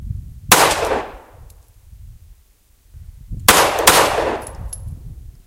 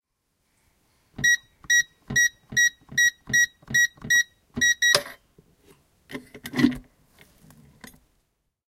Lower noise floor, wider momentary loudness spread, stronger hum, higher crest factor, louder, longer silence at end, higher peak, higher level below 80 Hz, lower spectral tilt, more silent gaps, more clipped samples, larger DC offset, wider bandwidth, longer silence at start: second, -53 dBFS vs -74 dBFS; first, 23 LU vs 18 LU; neither; second, 20 dB vs 26 dB; first, -14 LUFS vs -21 LUFS; second, 0.15 s vs 1.95 s; about the same, 0 dBFS vs 0 dBFS; first, -36 dBFS vs -56 dBFS; about the same, -1.5 dB/octave vs -1 dB/octave; neither; neither; neither; about the same, 17 kHz vs 16.5 kHz; second, 0 s vs 1.2 s